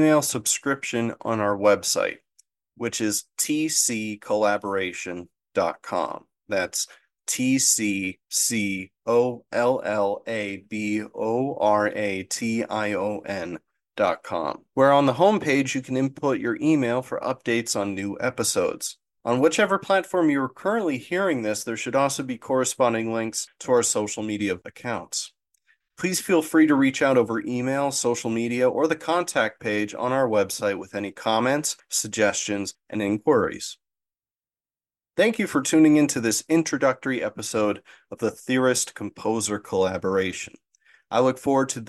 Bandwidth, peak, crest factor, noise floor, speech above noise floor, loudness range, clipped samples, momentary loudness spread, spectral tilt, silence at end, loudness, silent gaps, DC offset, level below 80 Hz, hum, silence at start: 12.5 kHz; -6 dBFS; 18 dB; under -90 dBFS; over 66 dB; 4 LU; under 0.1%; 10 LU; -3.5 dB/octave; 0 s; -24 LUFS; none; under 0.1%; -66 dBFS; none; 0 s